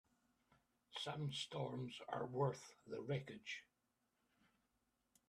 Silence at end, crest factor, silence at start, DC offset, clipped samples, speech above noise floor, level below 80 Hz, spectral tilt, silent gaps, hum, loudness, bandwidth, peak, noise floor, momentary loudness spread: 1.65 s; 22 dB; 0.9 s; under 0.1%; under 0.1%; 40 dB; -84 dBFS; -5.5 dB/octave; none; none; -47 LUFS; 12.5 kHz; -28 dBFS; -87 dBFS; 10 LU